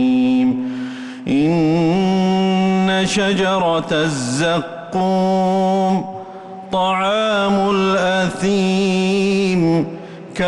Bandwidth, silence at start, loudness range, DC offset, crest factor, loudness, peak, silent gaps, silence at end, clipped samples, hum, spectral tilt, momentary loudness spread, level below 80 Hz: 11.5 kHz; 0 s; 2 LU; under 0.1%; 10 dB; -17 LUFS; -8 dBFS; none; 0 s; under 0.1%; none; -5.5 dB/octave; 9 LU; -50 dBFS